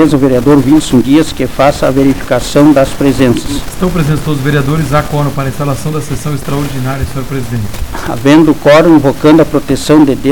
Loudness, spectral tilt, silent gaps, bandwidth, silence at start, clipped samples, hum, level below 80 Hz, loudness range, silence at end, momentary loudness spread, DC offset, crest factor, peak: -10 LUFS; -6.5 dB/octave; none; 17.5 kHz; 0 s; under 0.1%; none; -26 dBFS; 6 LU; 0 s; 11 LU; 7%; 10 dB; 0 dBFS